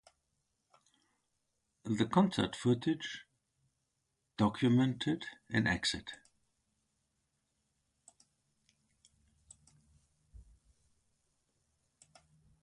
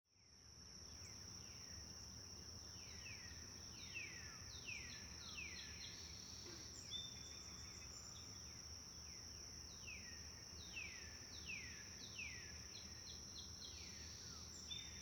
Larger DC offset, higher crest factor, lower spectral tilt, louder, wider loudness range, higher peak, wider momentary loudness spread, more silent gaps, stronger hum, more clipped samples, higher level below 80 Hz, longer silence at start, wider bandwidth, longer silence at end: neither; first, 24 dB vs 16 dB; first, -5.5 dB/octave vs -1.5 dB/octave; first, -33 LUFS vs -52 LUFS; first, 6 LU vs 2 LU; first, -16 dBFS vs -38 dBFS; first, 19 LU vs 4 LU; neither; neither; neither; about the same, -64 dBFS vs -66 dBFS; first, 1.85 s vs 0.1 s; second, 11.5 kHz vs over 20 kHz; first, 6.5 s vs 0 s